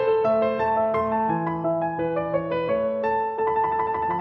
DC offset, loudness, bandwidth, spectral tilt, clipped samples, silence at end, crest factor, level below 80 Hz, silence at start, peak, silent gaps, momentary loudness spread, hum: under 0.1%; -24 LUFS; 5.8 kHz; -9 dB/octave; under 0.1%; 0 s; 12 dB; -54 dBFS; 0 s; -12 dBFS; none; 4 LU; none